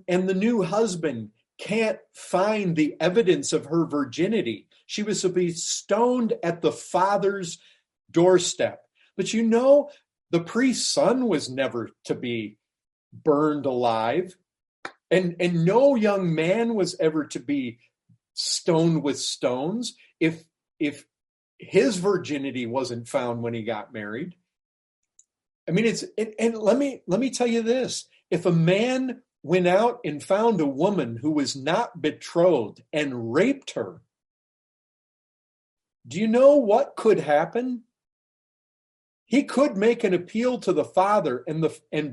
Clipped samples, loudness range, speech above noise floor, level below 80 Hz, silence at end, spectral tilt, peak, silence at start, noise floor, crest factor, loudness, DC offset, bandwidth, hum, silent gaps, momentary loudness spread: under 0.1%; 4 LU; over 67 dB; -70 dBFS; 0 s; -5 dB/octave; -6 dBFS; 0.1 s; under -90 dBFS; 18 dB; -24 LUFS; under 0.1%; 11.5 kHz; none; 12.92-13.11 s, 14.68-14.83 s, 21.29-21.58 s, 24.65-25.03 s, 25.55-25.67 s, 34.30-35.77 s, 38.12-39.26 s; 12 LU